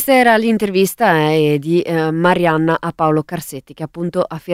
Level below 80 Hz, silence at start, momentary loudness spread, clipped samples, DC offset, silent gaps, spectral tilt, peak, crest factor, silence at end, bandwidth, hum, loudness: -52 dBFS; 0 s; 13 LU; under 0.1%; under 0.1%; none; -6 dB/octave; 0 dBFS; 14 dB; 0 s; 16 kHz; none; -15 LUFS